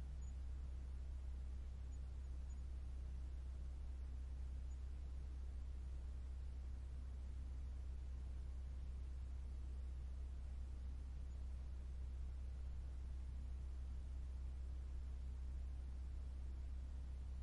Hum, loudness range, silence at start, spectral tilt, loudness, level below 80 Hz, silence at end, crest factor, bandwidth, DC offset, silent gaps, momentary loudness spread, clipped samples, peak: none; 1 LU; 0 s; -7 dB/octave; -52 LUFS; -48 dBFS; 0 s; 8 dB; 10.5 kHz; under 0.1%; none; 1 LU; under 0.1%; -40 dBFS